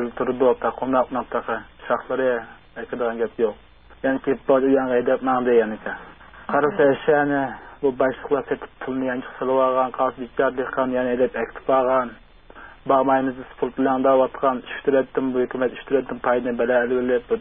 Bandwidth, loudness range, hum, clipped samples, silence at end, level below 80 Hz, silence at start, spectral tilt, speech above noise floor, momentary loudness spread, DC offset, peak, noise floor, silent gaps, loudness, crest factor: 3.8 kHz; 3 LU; none; under 0.1%; 0 s; -52 dBFS; 0 s; -10.5 dB/octave; 23 dB; 10 LU; 0.2%; -6 dBFS; -44 dBFS; none; -22 LUFS; 16 dB